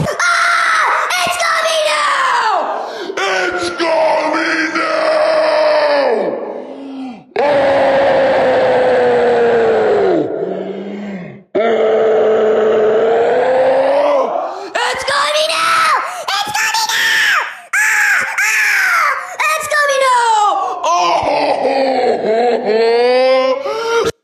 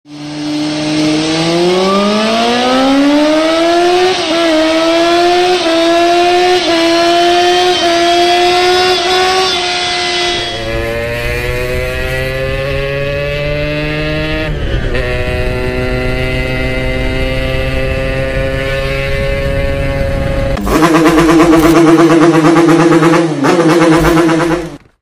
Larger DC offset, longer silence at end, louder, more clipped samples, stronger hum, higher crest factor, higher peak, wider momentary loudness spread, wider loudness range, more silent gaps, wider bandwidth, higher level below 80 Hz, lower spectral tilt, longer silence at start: neither; second, 0.1 s vs 0.25 s; about the same, -13 LUFS vs -11 LUFS; second, under 0.1% vs 0.5%; neither; about the same, 10 dB vs 10 dB; about the same, -2 dBFS vs 0 dBFS; about the same, 8 LU vs 9 LU; second, 2 LU vs 8 LU; neither; about the same, 16 kHz vs 16 kHz; second, -54 dBFS vs -24 dBFS; second, -2.5 dB/octave vs -5 dB/octave; about the same, 0 s vs 0.1 s